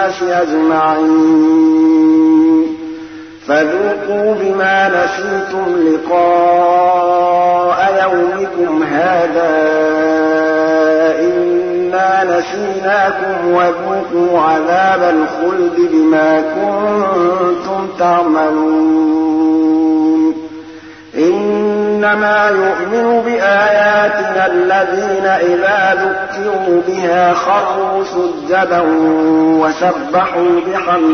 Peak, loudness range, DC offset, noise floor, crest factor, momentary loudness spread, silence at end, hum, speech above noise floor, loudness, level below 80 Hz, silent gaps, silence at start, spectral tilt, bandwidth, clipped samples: -2 dBFS; 2 LU; 0.1%; -33 dBFS; 10 dB; 6 LU; 0 s; none; 21 dB; -12 LUFS; -54 dBFS; none; 0 s; -6 dB/octave; 6.6 kHz; under 0.1%